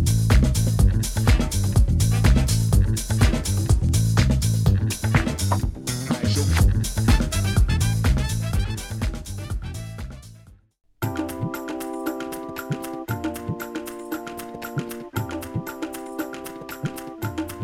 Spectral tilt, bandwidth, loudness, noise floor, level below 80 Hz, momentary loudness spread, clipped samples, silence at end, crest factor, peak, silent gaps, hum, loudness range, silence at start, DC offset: -5.5 dB/octave; 16.5 kHz; -23 LUFS; -49 dBFS; -26 dBFS; 12 LU; under 0.1%; 0 s; 18 dB; -4 dBFS; none; none; 11 LU; 0 s; under 0.1%